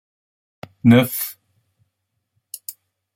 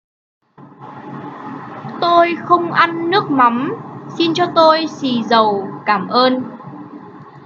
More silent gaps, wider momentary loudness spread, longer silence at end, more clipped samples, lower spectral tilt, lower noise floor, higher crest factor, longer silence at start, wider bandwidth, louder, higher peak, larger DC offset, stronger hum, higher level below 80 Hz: neither; about the same, 21 LU vs 20 LU; first, 0.45 s vs 0.05 s; neither; about the same, -6 dB/octave vs -5.5 dB/octave; first, -75 dBFS vs -39 dBFS; about the same, 20 dB vs 16 dB; first, 0.85 s vs 0.6 s; first, 16.5 kHz vs 7.2 kHz; about the same, -17 LUFS vs -15 LUFS; about the same, -2 dBFS vs 0 dBFS; neither; neither; about the same, -62 dBFS vs -66 dBFS